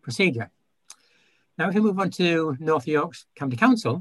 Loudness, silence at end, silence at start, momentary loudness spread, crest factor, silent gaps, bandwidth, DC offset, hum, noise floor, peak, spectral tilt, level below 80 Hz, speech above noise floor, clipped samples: -23 LUFS; 0 s; 0.05 s; 12 LU; 18 dB; none; 12.5 kHz; under 0.1%; none; -65 dBFS; -6 dBFS; -6 dB/octave; -66 dBFS; 42 dB; under 0.1%